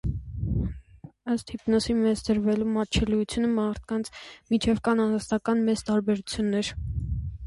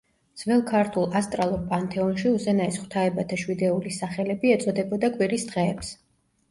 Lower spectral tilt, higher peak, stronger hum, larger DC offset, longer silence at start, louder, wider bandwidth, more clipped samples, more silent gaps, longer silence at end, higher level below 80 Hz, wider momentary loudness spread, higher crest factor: about the same, -6 dB/octave vs -6 dB/octave; about the same, -10 dBFS vs -8 dBFS; neither; neither; second, 0.05 s vs 0.35 s; about the same, -27 LUFS vs -25 LUFS; about the same, 11.5 kHz vs 11.5 kHz; neither; neither; second, 0 s vs 0.55 s; first, -40 dBFS vs -54 dBFS; first, 9 LU vs 6 LU; about the same, 16 dB vs 16 dB